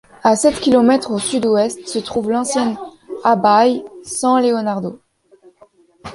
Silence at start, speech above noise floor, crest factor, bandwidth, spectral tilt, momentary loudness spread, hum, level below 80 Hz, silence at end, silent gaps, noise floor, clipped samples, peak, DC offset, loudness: 0.25 s; 35 dB; 16 dB; 11.5 kHz; -4 dB/octave; 12 LU; none; -54 dBFS; 0 s; none; -50 dBFS; under 0.1%; -2 dBFS; under 0.1%; -16 LUFS